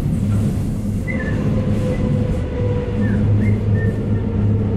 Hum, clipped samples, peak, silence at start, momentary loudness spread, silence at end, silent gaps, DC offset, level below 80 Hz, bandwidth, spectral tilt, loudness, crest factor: none; under 0.1%; -6 dBFS; 0 s; 5 LU; 0 s; none; under 0.1%; -28 dBFS; 10.5 kHz; -9 dB/octave; -19 LUFS; 12 dB